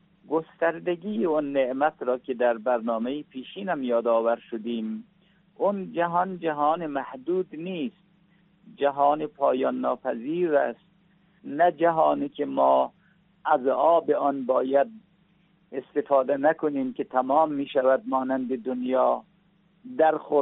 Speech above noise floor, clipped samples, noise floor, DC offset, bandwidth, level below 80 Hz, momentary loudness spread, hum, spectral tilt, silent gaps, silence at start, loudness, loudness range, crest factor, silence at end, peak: 38 dB; under 0.1%; -63 dBFS; under 0.1%; 4 kHz; -76 dBFS; 10 LU; none; -4.5 dB/octave; none; 0.3 s; -25 LUFS; 4 LU; 18 dB; 0 s; -8 dBFS